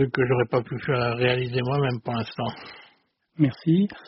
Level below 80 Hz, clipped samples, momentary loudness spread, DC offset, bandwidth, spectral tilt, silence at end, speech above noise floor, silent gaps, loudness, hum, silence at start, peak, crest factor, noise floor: -56 dBFS; under 0.1%; 9 LU; under 0.1%; 5.8 kHz; -5.5 dB/octave; 0.05 s; 39 dB; none; -25 LUFS; none; 0 s; -8 dBFS; 16 dB; -63 dBFS